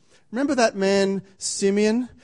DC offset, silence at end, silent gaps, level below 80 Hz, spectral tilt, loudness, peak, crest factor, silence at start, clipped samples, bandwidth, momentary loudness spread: 0.1%; 0.15 s; none; -62 dBFS; -4.5 dB/octave; -22 LUFS; -6 dBFS; 16 dB; 0.3 s; under 0.1%; 11 kHz; 8 LU